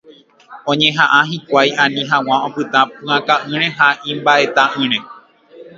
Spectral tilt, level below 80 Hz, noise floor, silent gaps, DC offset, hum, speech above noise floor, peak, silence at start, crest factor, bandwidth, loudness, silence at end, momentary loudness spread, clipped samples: -4 dB/octave; -64 dBFS; -44 dBFS; none; under 0.1%; none; 30 dB; 0 dBFS; 0.1 s; 16 dB; 7.8 kHz; -14 LUFS; 0.1 s; 6 LU; under 0.1%